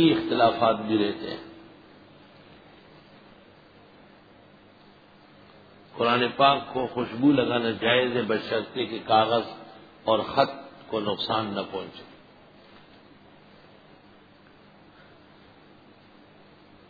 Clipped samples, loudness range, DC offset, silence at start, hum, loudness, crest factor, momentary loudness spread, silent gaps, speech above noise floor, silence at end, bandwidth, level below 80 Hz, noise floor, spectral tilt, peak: under 0.1%; 12 LU; under 0.1%; 0 s; 50 Hz at -60 dBFS; -25 LUFS; 22 dB; 17 LU; none; 30 dB; 4.85 s; 5 kHz; -66 dBFS; -54 dBFS; -7.5 dB/octave; -6 dBFS